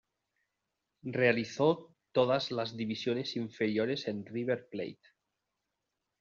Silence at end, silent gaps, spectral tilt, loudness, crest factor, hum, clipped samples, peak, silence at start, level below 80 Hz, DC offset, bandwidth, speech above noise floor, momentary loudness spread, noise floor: 1.3 s; none; -4 dB/octave; -33 LUFS; 20 dB; none; under 0.1%; -14 dBFS; 1.05 s; -74 dBFS; under 0.1%; 7.4 kHz; 54 dB; 10 LU; -86 dBFS